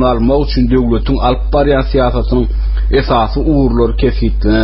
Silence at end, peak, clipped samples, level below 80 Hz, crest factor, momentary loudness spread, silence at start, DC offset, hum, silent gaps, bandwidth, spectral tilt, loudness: 0 s; 0 dBFS; under 0.1%; -16 dBFS; 10 dB; 3 LU; 0 s; under 0.1%; none; none; 5.8 kHz; -6.5 dB/octave; -13 LUFS